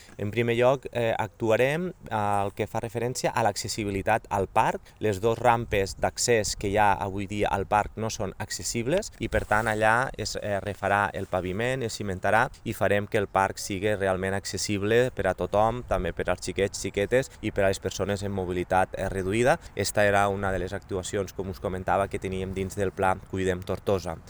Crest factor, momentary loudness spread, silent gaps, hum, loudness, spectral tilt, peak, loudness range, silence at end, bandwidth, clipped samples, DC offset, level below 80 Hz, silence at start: 20 dB; 8 LU; none; none; -27 LUFS; -4.5 dB/octave; -6 dBFS; 2 LU; 0 s; over 20 kHz; under 0.1%; under 0.1%; -46 dBFS; 0 s